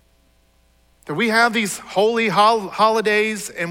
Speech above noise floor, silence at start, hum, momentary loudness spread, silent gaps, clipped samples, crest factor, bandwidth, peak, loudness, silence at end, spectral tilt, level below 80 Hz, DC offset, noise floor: 40 dB; 1.05 s; none; 7 LU; none; under 0.1%; 16 dB; 16.5 kHz; -4 dBFS; -18 LUFS; 0 s; -3.5 dB/octave; -60 dBFS; under 0.1%; -58 dBFS